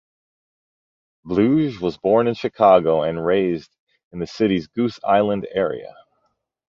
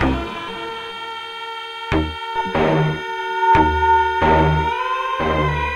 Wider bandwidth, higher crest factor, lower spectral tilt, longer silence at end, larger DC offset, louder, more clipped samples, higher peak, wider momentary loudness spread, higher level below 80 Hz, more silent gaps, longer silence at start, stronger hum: second, 7.4 kHz vs 11 kHz; about the same, 18 dB vs 16 dB; about the same, -7.5 dB/octave vs -6.5 dB/octave; first, 0.85 s vs 0 s; neither; about the same, -19 LUFS vs -19 LUFS; neither; about the same, -2 dBFS vs -4 dBFS; about the same, 12 LU vs 13 LU; second, -54 dBFS vs -32 dBFS; first, 3.79-3.87 s, 4.04-4.11 s vs none; first, 1.25 s vs 0 s; neither